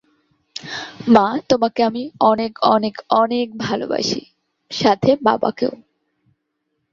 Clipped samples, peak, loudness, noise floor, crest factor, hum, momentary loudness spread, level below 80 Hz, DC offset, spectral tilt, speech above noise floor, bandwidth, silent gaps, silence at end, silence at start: under 0.1%; -2 dBFS; -18 LUFS; -73 dBFS; 18 dB; none; 13 LU; -58 dBFS; under 0.1%; -5 dB/octave; 56 dB; 7.4 kHz; none; 1.15 s; 0.65 s